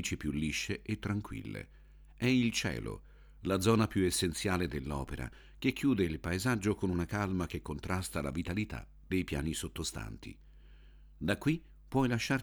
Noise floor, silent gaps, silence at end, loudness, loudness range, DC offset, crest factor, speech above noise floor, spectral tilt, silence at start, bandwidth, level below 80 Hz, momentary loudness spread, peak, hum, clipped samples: -56 dBFS; none; 0 s; -34 LUFS; 5 LU; under 0.1%; 20 dB; 22 dB; -5 dB/octave; 0 s; over 20 kHz; -50 dBFS; 14 LU; -14 dBFS; none; under 0.1%